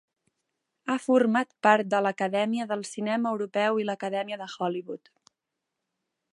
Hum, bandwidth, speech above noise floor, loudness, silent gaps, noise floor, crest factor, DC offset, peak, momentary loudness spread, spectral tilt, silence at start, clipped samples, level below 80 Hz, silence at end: none; 11.5 kHz; 58 dB; -27 LUFS; none; -85 dBFS; 24 dB; under 0.1%; -4 dBFS; 11 LU; -5 dB/octave; 0.85 s; under 0.1%; -82 dBFS; 1.35 s